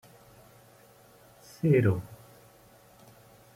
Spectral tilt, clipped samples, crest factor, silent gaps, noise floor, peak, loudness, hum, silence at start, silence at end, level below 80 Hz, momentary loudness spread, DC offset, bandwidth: -8.5 dB/octave; under 0.1%; 20 dB; none; -57 dBFS; -12 dBFS; -27 LUFS; none; 1.65 s; 1.4 s; -64 dBFS; 28 LU; under 0.1%; 16.5 kHz